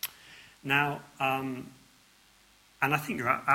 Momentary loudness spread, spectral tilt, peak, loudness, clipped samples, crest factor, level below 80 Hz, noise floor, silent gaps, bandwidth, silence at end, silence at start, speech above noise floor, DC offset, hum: 21 LU; -4.5 dB/octave; -10 dBFS; -30 LUFS; under 0.1%; 22 dB; -68 dBFS; -61 dBFS; none; 16.5 kHz; 0 s; 0.05 s; 32 dB; under 0.1%; none